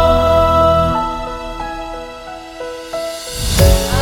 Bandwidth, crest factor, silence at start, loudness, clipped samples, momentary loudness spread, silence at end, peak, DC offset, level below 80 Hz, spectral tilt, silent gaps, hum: 18 kHz; 14 dB; 0 s; -15 LUFS; under 0.1%; 17 LU; 0 s; 0 dBFS; under 0.1%; -22 dBFS; -5 dB/octave; none; none